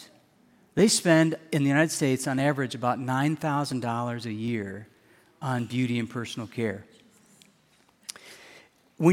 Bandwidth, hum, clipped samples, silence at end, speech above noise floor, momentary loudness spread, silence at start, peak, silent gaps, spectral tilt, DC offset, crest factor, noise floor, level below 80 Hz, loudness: 16.5 kHz; none; under 0.1%; 0 s; 37 dB; 19 LU; 0 s; -8 dBFS; none; -5 dB/octave; under 0.1%; 20 dB; -63 dBFS; -68 dBFS; -26 LUFS